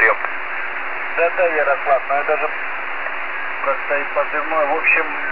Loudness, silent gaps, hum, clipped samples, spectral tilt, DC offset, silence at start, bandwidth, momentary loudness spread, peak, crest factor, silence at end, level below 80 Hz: -19 LUFS; none; none; under 0.1%; -6 dB/octave; 4%; 0 s; 5.2 kHz; 9 LU; -2 dBFS; 16 dB; 0 s; -58 dBFS